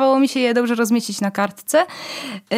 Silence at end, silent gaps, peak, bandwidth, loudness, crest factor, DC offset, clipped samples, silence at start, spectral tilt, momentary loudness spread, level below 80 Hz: 0 s; none; -4 dBFS; 16 kHz; -19 LUFS; 14 dB; under 0.1%; under 0.1%; 0 s; -4 dB/octave; 11 LU; -72 dBFS